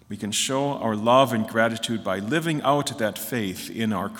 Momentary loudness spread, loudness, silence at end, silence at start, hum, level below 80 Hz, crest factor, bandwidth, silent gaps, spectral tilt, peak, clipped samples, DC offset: 9 LU; -24 LUFS; 0 s; 0.1 s; none; -66 dBFS; 18 dB; 18 kHz; none; -4 dB/octave; -6 dBFS; under 0.1%; under 0.1%